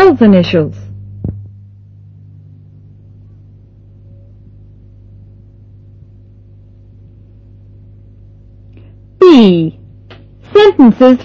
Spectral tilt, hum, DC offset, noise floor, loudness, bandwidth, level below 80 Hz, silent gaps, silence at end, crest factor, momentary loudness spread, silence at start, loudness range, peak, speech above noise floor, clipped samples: -8 dB/octave; 50 Hz at -40 dBFS; under 0.1%; -39 dBFS; -8 LUFS; 7.4 kHz; -42 dBFS; none; 0 s; 14 dB; 21 LU; 0 s; 22 LU; 0 dBFS; 32 dB; 1%